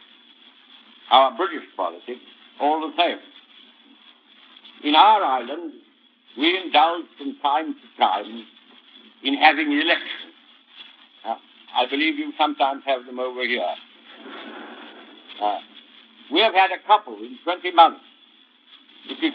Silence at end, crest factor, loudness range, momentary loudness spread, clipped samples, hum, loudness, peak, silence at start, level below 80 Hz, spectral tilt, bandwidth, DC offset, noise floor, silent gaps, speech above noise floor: 0 s; 24 dB; 6 LU; 22 LU; under 0.1%; none; -21 LUFS; 0 dBFS; 1.1 s; under -90 dBFS; 2.5 dB/octave; 5.4 kHz; under 0.1%; -55 dBFS; none; 35 dB